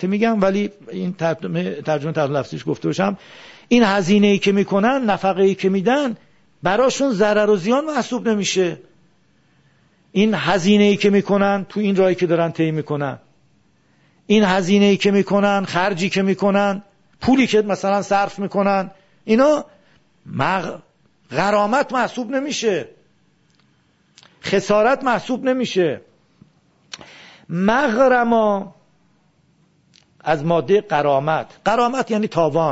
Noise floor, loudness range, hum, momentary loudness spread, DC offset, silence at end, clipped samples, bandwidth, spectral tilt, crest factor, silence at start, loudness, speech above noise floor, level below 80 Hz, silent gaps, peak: -60 dBFS; 4 LU; none; 11 LU; under 0.1%; 0 s; under 0.1%; 8 kHz; -5.5 dB/octave; 16 dB; 0 s; -18 LUFS; 42 dB; -54 dBFS; none; -2 dBFS